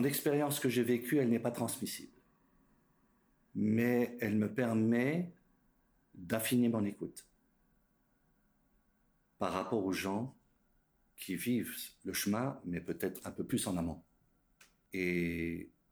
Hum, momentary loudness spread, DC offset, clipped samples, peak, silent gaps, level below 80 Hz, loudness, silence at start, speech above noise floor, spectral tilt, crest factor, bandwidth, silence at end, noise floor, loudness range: none; 14 LU; under 0.1%; under 0.1%; -18 dBFS; none; -68 dBFS; -35 LUFS; 0 s; 40 dB; -5.5 dB/octave; 18 dB; over 20 kHz; 0.25 s; -74 dBFS; 6 LU